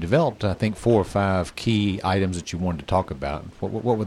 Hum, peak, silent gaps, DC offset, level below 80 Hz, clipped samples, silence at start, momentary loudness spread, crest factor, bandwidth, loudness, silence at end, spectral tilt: none; -6 dBFS; none; under 0.1%; -44 dBFS; under 0.1%; 0 s; 9 LU; 16 dB; 12.5 kHz; -24 LUFS; 0 s; -6.5 dB/octave